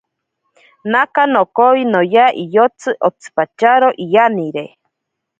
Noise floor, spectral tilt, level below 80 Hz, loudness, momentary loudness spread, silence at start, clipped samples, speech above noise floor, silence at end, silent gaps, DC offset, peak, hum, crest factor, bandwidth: -77 dBFS; -5.5 dB/octave; -66 dBFS; -13 LUFS; 10 LU; 0.85 s; under 0.1%; 64 dB; 0.7 s; none; under 0.1%; 0 dBFS; none; 14 dB; 8.8 kHz